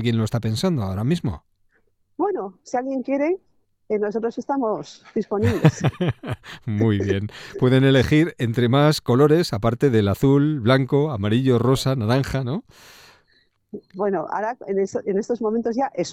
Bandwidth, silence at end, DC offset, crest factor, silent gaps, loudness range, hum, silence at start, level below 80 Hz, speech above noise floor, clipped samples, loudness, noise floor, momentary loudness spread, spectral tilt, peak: 15.5 kHz; 0 s; under 0.1%; 20 dB; none; 8 LU; none; 0 s; -48 dBFS; 44 dB; under 0.1%; -21 LUFS; -64 dBFS; 11 LU; -7 dB/octave; 0 dBFS